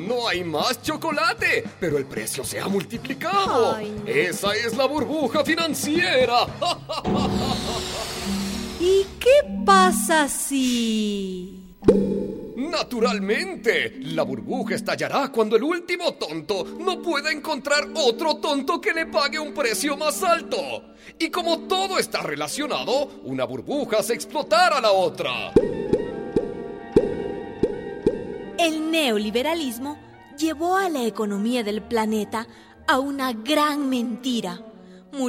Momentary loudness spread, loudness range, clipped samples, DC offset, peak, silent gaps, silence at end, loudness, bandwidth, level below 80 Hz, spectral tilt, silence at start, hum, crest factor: 9 LU; 5 LU; under 0.1%; under 0.1%; -4 dBFS; none; 0 s; -23 LUFS; 16.5 kHz; -48 dBFS; -4 dB/octave; 0 s; none; 18 dB